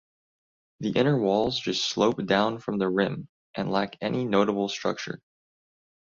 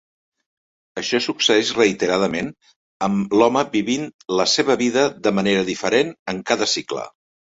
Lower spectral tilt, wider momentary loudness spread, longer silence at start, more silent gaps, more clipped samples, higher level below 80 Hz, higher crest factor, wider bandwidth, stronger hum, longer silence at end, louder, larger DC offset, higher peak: first, -5.5 dB/octave vs -3.5 dB/octave; about the same, 11 LU vs 11 LU; second, 0.8 s vs 0.95 s; second, 3.29-3.54 s vs 2.76-3.00 s, 4.14-4.19 s, 6.19-6.26 s; neither; about the same, -62 dBFS vs -58 dBFS; about the same, 20 dB vs 18 dB; about the same, 7.6 kHz vs 8 kHz; neither; first, 0.85 s vs 0.45 s; second, -26 LUFS vs -19 LUFS; neither; second, -8 dBFS vs -2 dBFS